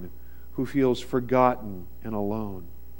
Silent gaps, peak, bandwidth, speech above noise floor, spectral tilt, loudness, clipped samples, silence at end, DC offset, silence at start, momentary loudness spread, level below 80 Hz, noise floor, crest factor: none; -6 dBFS; 16.5 kHz; 21 dB; -7.5 dB/octave; -26 LUFS; under 0.1%; 0 s; 1%; 0 s; 17 LU; -48 dBFS; -47 dBFS; 22 dB